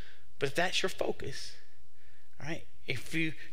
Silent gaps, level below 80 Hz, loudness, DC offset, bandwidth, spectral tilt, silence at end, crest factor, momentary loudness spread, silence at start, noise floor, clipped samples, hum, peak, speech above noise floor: none; -64 dBFS; -35 LUFS; 3%; 16 kHz; -4 dB/octave; 0 s; 22 dB; 13 LU; 0 s; -65 dBFS; under 0.1%; none; -14 dBFS; 30 dB